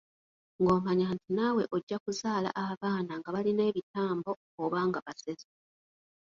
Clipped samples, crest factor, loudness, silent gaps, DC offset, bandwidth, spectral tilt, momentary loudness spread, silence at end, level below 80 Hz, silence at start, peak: under 0.1%; 20 dB; -32 LUFS; 1.83-1.87 s, 2.00-2.06 s, 2.77-2.81 s, 3.83-3.94 s, 4.36-4.58 s, 5.02-5.06 s; under 0.1%; 7.8 kHz; -6.5 dB/octave; 10 LU; 1 s; -68 dBFS; 0.6 s; -14 dBFS